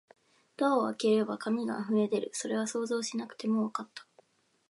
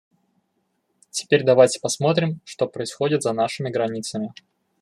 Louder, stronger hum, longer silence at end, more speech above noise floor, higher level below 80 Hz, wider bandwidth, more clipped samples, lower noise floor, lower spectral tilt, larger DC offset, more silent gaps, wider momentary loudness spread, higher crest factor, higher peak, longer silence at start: second, -31 LUFS vs -22 LUFS; neither; first, 0.7 s vs 0.5 s; second, 36 dB vs 51 dB; second, -86 dBFS vs -68 dBFS; second, 11.5 kHz vs 13 kHz; neither; second, -66 dBFS vs -72 dBFS; about the same, -4.5 dB/octave vs -4.5 dB/octave; neither; neither; second, 8 LU vs 14 LU; about the same, 16 dB vs 20 dB; second, -16 dBFS vs -2 dBFS; second, 0.6 s vs 1.15 s